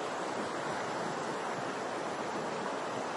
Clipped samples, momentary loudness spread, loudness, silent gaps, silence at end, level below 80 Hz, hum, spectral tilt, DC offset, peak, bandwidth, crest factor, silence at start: under 0.1%; 1 LU; -36 LUFS; none; 0 s; -82 dBFS; none; -4 dB/octave; under 0.1%; -24 dBFS; 11.5 kHz; 12 dB; 0 s